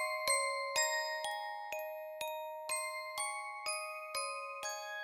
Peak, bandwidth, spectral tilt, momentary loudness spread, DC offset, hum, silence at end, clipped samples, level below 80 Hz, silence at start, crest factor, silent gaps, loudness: -20 dBFS; 17 kHz; 2.5 dB/octave; 9 LU; under 0.1%; none; 0 s; under 0.1%; -82 dBFS; 0 s; 18 dB; none; -38 LUFS